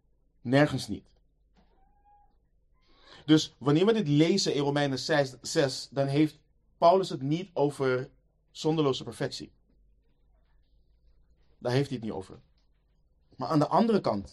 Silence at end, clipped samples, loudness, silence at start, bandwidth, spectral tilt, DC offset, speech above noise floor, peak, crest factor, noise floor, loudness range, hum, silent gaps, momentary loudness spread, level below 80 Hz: 0.05 s; under 0.1%; -27 LUFS; 0.45 s; 12.5 kHz; -5.5 dB/octave; under 0.1%; 40 dB; -8 dBFS; 20 dB; -67 dBFS; 11 LU; none; none; 15 LU; -62 dBFS